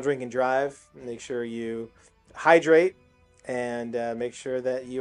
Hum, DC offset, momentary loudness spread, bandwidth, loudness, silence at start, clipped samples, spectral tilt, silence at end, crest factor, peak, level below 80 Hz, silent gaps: none; under 0.1%; 18 LU; 11 kHz; -26 LUFS; 0 s; under 0.1%; -5 dB/octave; 0 s; 24 dB; -2 dBFS; -66 dBFS; none